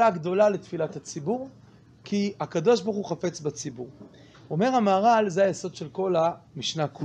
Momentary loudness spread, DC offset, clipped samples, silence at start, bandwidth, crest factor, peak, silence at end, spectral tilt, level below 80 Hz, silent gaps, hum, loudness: 13 LU; under 0.1%; under 0.1%; 0 s; 9.8 kHz; 16 dB; -8 dBFS; 0 s; -5.5 dB/octave; -68 dBFS; none; none; -26 LUFS